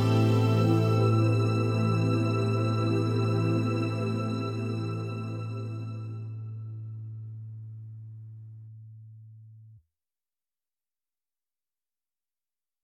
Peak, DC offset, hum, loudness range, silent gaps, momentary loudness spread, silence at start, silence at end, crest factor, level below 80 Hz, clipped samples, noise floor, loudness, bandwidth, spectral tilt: -12 dBFS; under 0.1%; none; 21 LU; none; 21 LU; 0 s; 3.15 s; 16 dB; -64 dBFS; under 0.1%; under -90 dBFS; -28 LUFS; 9.6 kHz; -8 dB/octave